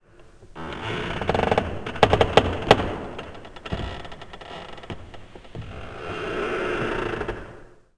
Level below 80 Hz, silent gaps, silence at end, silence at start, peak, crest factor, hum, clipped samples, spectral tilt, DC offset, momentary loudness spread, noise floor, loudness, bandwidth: -40 dBFS; none; 0.3 s; 0.2 s; 0 dBFS; 26 dB; none; under 0.1%; -5.5 dB/octave; 0.1%; 20 LU; -49 dBFS; -24 LUFS; 11 kHz